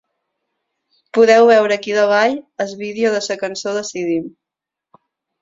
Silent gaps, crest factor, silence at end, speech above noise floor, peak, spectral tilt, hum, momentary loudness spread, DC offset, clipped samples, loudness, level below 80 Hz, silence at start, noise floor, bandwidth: none; 16 dB; 1.15 s; 69 dB; 0 dBFS; -3.5 dB/octave; none; 14 LU; under 0.1%; under 0.1%; -16 LUFS; -66 dBFS; 1.15 s; -85 dBFS; 7.8 kHz